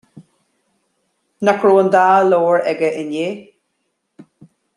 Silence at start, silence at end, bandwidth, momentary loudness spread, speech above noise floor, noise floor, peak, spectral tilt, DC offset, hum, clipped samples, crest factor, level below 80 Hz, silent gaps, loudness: 0.15 s; 0.55 s; 11.5 kHz; 11 LU; 57 dB; -71 dBFS; -2 dBFS; -6 dB/octave; under 0.1%; none; under 0.1%; 16 dB; -70 dBFS; none; -15 LUFS